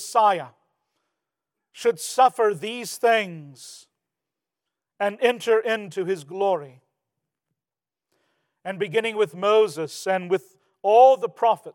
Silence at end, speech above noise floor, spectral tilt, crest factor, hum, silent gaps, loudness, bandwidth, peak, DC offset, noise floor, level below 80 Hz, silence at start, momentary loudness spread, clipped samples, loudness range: 0.05 s; over 68 dB; -3.5 dB/octave; 20 dB; none; none; -22 LUFS; 18 kHz; -4 dBFS; under 0.1%; under -90 dBFS; -90 dBFS; 0 s; 14 LU; under 0.1%; 7 LU